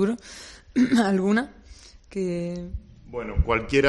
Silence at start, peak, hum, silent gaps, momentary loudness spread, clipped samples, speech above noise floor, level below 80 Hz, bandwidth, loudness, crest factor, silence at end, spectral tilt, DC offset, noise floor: 0 s; -6 dBFS; none; none; 17 LU; under 0.1%; 25 dB; -36 dBFS; 11.5 kHz; -25 LUFS; 20 dB; 0 s; -6.5 dB/octave; under 0.1%; -48 dBFS